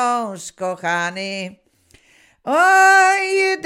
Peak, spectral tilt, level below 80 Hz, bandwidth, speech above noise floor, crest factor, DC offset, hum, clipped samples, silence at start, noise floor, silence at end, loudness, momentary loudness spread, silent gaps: 0 dBFS; -2.5 dB/octave; -70 dBFS; 16 kHz; 37 dB; 16 dB; under 0.1%; none; under 0.1%; 0 s; -54 dBFS; 0 s; -16 LUFS; 18 LU; none